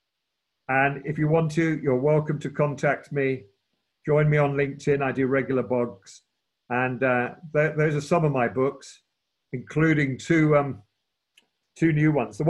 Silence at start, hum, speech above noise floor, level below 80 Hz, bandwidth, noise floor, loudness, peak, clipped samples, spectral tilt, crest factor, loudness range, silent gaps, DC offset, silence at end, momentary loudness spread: 0.7 s; none; 58 dB; -58 dBFS; 9 kHz; -81 dBFS; -24 LUFS; -8 dBFS; under 0.1%; -7.5 dB/octave; 18 dB; 1 LU; none; under 0.1%; 0 s; 9 LU